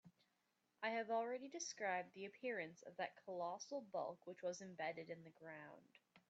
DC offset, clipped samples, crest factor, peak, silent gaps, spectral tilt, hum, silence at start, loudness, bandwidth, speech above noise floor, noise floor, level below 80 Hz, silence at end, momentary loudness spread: under 0.1%; under 0.1%; 18 dB; -30 dBFS; none; -2.5 dB/octave; none; 0.05 s; -48 LUFS; 7.6 kHz; 37 dB; -86 dBFS; under -90 dBFS; 0.1 s; 13 LU